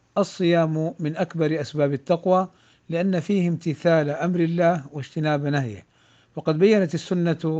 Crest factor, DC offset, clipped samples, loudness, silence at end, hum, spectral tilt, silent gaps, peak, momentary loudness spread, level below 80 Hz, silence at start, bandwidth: 16 dB; under 0.1%; under 0.1%; -23 LUFS; 0 s; none; -7.5 dB/octave; none; -6 dBFS; 9 LU; -66 dBFS; 0.15 s; 8 kHz